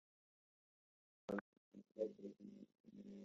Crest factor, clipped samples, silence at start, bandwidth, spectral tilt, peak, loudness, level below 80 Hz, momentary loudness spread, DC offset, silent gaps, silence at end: 22 dB; under 0.1%; 1.3 s; 7.4 kHz; -6.5 dB/octave; -32 dBFS; -52 LUFS; -88 dBFS; 15 LU; under 0.1%; 1.41-1.72 s, 2.80-2.84 s; 0 s